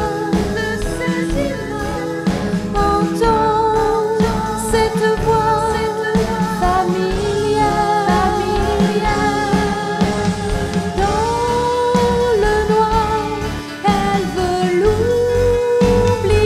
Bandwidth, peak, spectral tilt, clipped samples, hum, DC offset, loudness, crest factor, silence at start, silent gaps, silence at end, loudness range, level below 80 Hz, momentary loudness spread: 15.5 kHz; -2 dBFS; -5.5 dB/octave; under 0.1%; none; under 0.1%; -17 LUFS; 14 dB; 0 s; none; 0 s; 1 LU; -28 dBFS; 5 LU